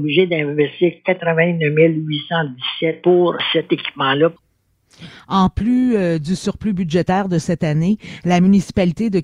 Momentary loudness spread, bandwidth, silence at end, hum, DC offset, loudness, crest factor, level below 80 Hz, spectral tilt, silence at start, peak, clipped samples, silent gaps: 7 LU; 11 kHz; 0 s; none; under 0.1%; -17 LUFS; 16 dB; -42 dBFS; -6.5 dB/octave; 0 s; -2 dBFS; under 0.1%; none